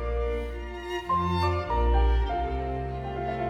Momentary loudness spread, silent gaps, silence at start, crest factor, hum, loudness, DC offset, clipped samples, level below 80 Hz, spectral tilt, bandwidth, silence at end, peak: 9 LU; none; 0 s; 14 dB; none; -28 LUFS; under 0.1%; under 0.1%; -30 dBFS; -7.5 dB/octave; 7 kHz; 0 s; -14 dBFS